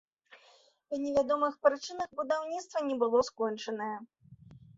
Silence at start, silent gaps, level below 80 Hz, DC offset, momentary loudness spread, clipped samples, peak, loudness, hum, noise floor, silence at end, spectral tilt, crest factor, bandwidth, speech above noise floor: 0.3 s; none; -70 dBFS; under 0.1%; 9 LU; under 0.1%; -12 dBFS; -32 LUFS; none; -64 dBFS; 0.2 s; -4 dB/octave; 22 dB; 7.8 kHz; 32 dB